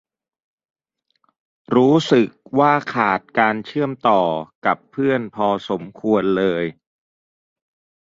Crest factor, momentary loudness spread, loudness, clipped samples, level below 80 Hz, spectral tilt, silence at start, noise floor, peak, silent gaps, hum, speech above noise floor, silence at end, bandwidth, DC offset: 20 dB; 8 LU; -19 LUFS; under 0.1%; -60 dBFS; -6.5 dB/octave; 1.7 s; -69 dBFS; 0 dBFS; 4.55-4.62 s; none; 51 dB; 1.3 s; 7.8 kHz; under 0.1%